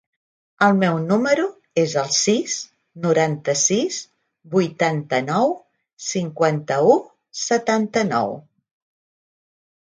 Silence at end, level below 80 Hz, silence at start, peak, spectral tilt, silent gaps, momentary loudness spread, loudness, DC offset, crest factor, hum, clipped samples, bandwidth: 1.6 s; -68 dBFS; 0.6 s; -2 dBFS; -4 dB/octave; 5.93-5.97 s; 10 LU; -20 LUFS; under 0.1%; 20 dB; none; under 0.1%; 10 kHz